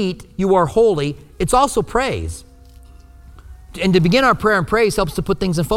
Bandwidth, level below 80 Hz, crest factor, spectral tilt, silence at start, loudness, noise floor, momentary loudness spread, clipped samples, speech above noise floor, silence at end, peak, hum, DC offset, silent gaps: 16.5 kHz; -36 dBFS; 16 dB; -5.5 dB/octave; 0 s; -17 LUFS; -42 dBFS; 11 LU; under 0.1%; 26 dB; 0 s; -2 dBFS; none; under 0.1%; none